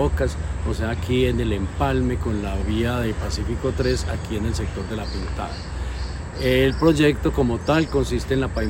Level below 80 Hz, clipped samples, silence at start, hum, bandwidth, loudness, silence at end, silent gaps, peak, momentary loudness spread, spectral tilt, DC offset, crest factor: -30 dBFS; under 0.1%; 0 s; none; 16.5 kHz; -23 LUFS; 0 s; none; -4 dBFS; 10 LU; -6.5 dB/octave; under 0.1%; 18 dB